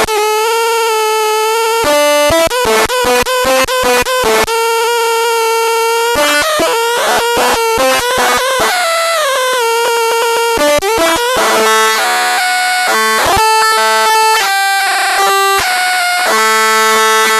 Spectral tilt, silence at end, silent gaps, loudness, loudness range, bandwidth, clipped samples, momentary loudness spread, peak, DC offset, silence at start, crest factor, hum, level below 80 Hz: -1 dB/octave; 0 s; none; -10 LUFS; 2 LU; 13.5 kHz; under 0.1%; 3 LU; 0 dBFS; under 0.1%; 0 s; 10 dB; none; -40 dBFS